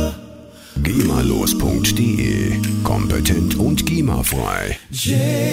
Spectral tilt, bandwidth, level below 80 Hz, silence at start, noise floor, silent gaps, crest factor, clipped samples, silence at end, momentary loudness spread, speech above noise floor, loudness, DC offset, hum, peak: -5 dB/octave; 16.5 kHz; -28 dBFS; 0 s; -39 dBFS; none; 16 dB; under 0.1%; 0 s; 6 LU; 21 dB; -18 LUFS; under 0.1%; none; -2 dBFS